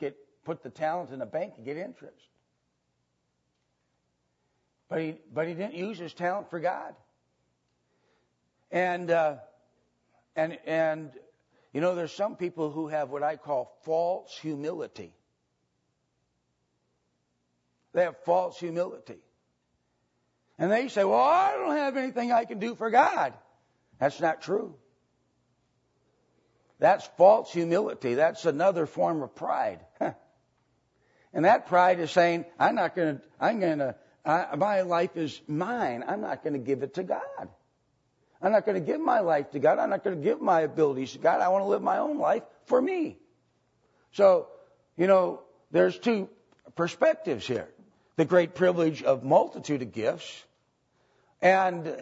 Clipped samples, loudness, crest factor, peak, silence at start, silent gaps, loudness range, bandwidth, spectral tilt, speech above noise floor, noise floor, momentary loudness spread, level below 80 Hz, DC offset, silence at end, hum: under 0.1%; -27 LUFS; 22 dB; -8 dBFS; 0 s; none; 10 LU; 8 kHz; -6 dB/octave; 50 dB; -77 dBFS; 14 LU; -78 dBFS; under 0.1%; 0 s; none